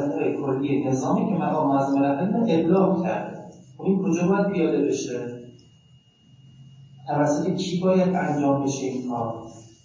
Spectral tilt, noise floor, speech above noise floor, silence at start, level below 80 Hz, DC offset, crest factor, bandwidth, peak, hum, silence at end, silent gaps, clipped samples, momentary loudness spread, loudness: -7 dB/octave; -56 dBFS; 33 dB; 0 s; -62 dBFS; under 0.1%; 16 dB; 7.6 kHz; -8 dBFS; none; 0.15 s; none; under 0.1%; 11 LU; -23 LUFS